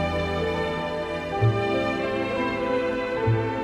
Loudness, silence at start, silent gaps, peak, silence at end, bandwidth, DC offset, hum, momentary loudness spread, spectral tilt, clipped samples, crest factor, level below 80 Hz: -25 LUFS; 0 s; none; -10 dBFS; 0 s; 11 kHz; under 0.1%; none; 5 LU; -7 dB/octave; under 0.1%; 14 dB; -44 dBFS